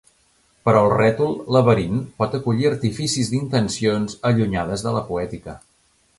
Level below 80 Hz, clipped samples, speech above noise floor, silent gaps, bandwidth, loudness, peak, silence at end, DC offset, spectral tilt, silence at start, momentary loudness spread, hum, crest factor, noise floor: -46 dBFS; under 0.1%; 41 dB; none; 11.5 kHz; -20 LUFS; -2 dBFS; 0.6 s; under 0.1%; -6 dB/octave; 0.65 s; 9 LU; none; 20 dB; -61 dBFS